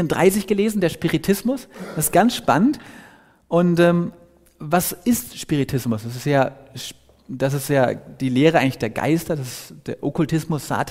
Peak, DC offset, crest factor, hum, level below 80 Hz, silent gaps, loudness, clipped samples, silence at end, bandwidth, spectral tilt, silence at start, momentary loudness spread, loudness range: -2 dBFS; under 0.1%; 18 dB; none; -50 dBFS; none; -20 LUFS; under 0.1%; 0 s; 16 kHz; -5.5 dB/octave; 0 s; 15 LU; 3 LU